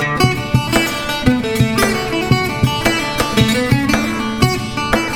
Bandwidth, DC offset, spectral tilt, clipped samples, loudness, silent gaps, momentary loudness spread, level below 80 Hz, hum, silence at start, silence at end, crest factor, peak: 19 kHz; under 0.1%; -5 dB/octave; under 0.1%; -16 LUFS; none; 3 LU; -32 dBFS; none; 0 s; 0 s; 14 dB; 0 dBFS